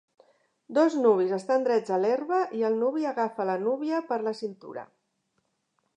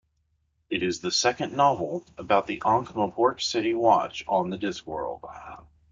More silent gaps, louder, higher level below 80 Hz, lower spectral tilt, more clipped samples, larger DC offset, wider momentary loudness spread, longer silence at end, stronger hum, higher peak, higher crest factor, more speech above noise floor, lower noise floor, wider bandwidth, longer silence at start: neither; about the same, -27 LUFS vs -26 LUFS; second, -86 dBFS vs -60 dBFS; first, -6.5 dB/octave vs -4 dB/octave; neither; neither; about the same, 12 LU vs 13 LU; first, 1.1 s vs 0.3 s; neither; second, -10 dBFS vs -6 dBFS; about the same, 18 dB vs 20 dB; first, 50 dB vs 46 dB; first, -76 dBFS vs -72 dBFS; about the same, 9.8 kHz vs 9.2 kHz; about the same, 0.7 s vs 0.7 s